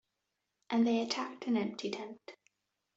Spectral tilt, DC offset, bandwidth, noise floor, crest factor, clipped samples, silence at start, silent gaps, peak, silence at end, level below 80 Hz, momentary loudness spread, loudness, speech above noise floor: -4.5 dB/octave; under 0.1%; 7.8 kHz; -86 dBFS; 16 dB; under 0.1%; 0.7 s; none; -20 dBFS; 0.65 s; -82 dBFS; 18 LU; -34 LUFS; 52 dB